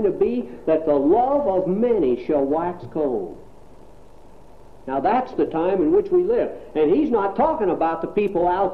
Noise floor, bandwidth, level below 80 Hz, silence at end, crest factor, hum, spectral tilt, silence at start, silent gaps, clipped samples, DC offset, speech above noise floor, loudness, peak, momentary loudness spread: -47 dBFS; 5.2 kHz; -48 dBFS; 0 s; 14 dB; none; -9 dB/octave; 0 s; none; under 0.1%; 0.7%; 27 dB; -21 LUFS; -8 dBFS; 8 LU